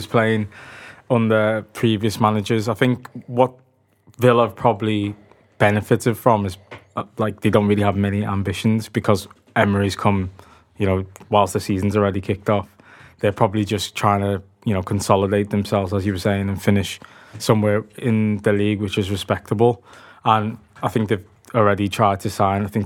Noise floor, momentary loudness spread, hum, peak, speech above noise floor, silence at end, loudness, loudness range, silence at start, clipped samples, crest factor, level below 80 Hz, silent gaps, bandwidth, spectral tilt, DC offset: -55 dBFS; 8 LU; none; 0 dBFS; 36 dB; 0 s; -20 LUFS; 1 LU; 0 s; under 0.1%; 20 dB; -54 dBFS; none; 16.5 kHz; -6.5 dB/octave; under 0.1%